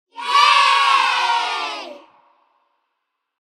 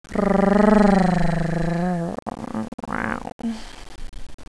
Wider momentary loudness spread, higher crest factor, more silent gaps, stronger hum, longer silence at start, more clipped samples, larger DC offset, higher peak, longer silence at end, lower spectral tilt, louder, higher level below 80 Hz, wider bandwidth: about the same, 16 LU vs 16 LU; about the same, 18 dB vs 18 dB; second, none vs 2.22-2.26 s, 2.68-2.78 s, 3.32-3.39 s, 4.34-4.38 s; neither; about the same, 0.15 s vs 0.1 s; neither; second, under 0.1% vs 0.4%; about the same, 0 dBFS vs -2 dBFS; first, 1.45 s vs 0.05 s; second, 2.5 dB/octave vs -7.5 dB/octave; first, -15 LUFS vs -21 LUFS; second, -78 dBFS vs -34 dBFS; first, 14.5 kHz vs 11 kHz